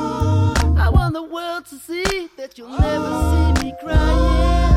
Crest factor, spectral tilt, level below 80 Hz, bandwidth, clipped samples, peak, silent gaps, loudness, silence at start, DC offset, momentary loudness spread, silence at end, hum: 14 dB; -6.5 dB/octave; -20 dBFS; 14.5 kHz; under 0.1%; -2 dBFS; none; -19 LUFS; 0 s; under 0.1%; 12 LU; 0 s; none